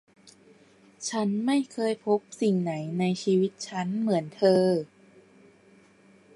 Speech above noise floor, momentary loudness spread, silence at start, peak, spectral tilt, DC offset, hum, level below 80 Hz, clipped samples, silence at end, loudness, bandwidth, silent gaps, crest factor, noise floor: 32 dB; 8 LU; 0.25 s; -10 dBFS; -6 dB/octave; under 0.1%; none; -76 dBFS; under 0.1%; 1.5 s; -27 LUFS; 11.5 kHz; none; 18 dB; -58 dBFS